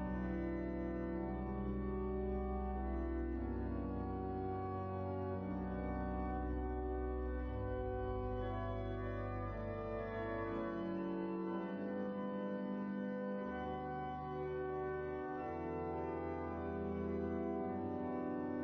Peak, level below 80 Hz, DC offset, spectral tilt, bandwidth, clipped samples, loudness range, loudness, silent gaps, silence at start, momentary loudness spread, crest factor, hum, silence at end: -30 dBFS; -48 dBFS; under 0.1%; -8 dB/octave; 5.4 kHz; under 0.1%; 1 LU; -42 LUFS; none; 0 s; 2 LU; 10 dB; none; 0 s